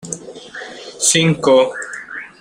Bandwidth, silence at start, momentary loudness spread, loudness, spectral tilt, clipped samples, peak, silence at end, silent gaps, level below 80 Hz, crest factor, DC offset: 16 kHz; 0.05 s; 19 LU; -14 LUFS; -3.5 dB/octave; under 0.1%; -2 dBFS; 0.15 s; none; -56 dBFS; 16 dB; under 0.1%